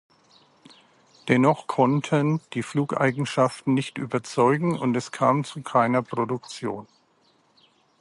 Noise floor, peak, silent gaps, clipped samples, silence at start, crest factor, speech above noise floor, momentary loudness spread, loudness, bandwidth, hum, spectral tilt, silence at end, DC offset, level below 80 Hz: -63 dBFS; -6 dBFS; none; under 0.1%; 1.25 s; 20 dB; 40 dB; 9 LU; -24 LUFS; 11.5 kHz; none; -6.5 dB/octave; 1.15 s; under 0.1%; -68 dBFS